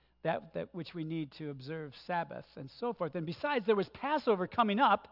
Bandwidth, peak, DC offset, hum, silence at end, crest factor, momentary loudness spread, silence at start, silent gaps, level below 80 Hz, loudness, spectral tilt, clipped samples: 5.8 kHz; -16 dBFS; under 0.1%; none; 0.05 s; 18 dB; 14 LU; 0.25 s; none; -72 dBFS; -34 LUFS; -4 dB/octave; under 0.1%